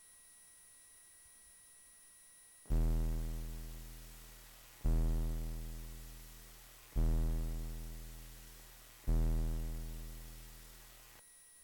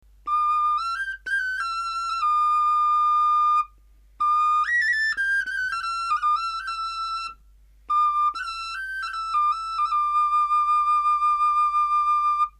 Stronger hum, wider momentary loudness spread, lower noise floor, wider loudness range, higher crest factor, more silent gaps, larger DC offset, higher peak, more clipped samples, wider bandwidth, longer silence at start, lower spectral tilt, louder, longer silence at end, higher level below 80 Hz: neither; first, 20 LU vs 9 LU; first, -61 dBFS vs -54 dBFS; about the same, 3 LU vs 5 LU; about the same, 14 dB vs 10 dB; neither; neither; second, -26 dBFS vs -14 dBFS; neither; first, 19 kHz vs 11.5 kHz; second, 0.05 s vs 0.25 s; first, -6 dB/octave vs 1.5 dB/octave; second, -42 LUFS vs -22 LUFS; about the same, 0 s vs 0.1 s; first, -40 dBFS vs -54 dBFS